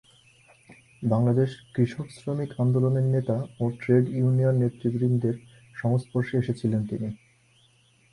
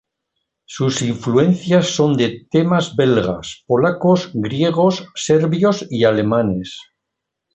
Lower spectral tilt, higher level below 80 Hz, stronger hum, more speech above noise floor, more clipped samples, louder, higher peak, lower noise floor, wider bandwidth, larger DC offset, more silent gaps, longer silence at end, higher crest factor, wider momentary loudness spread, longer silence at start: first, -9.5 dB/octave vs -6 dB/octave; second, -60 dBFS vs -50 dBFS; neither; second, 37 dB vs 63 dB; neither; second, -26 LUFS vs -17 LUFS; second, -10 dBFS vs -2 dBFS; second, -61 dBFS vs -79 dBFS; first, 11 kHz vs 8.4 kHz; neither; neither; first, 0.95 s vs 0.7 s; about the same, 16 dB vs 14 dB; about the same, 10 LU vs 8 LU; about the same, 0.7 s vs 0.7 s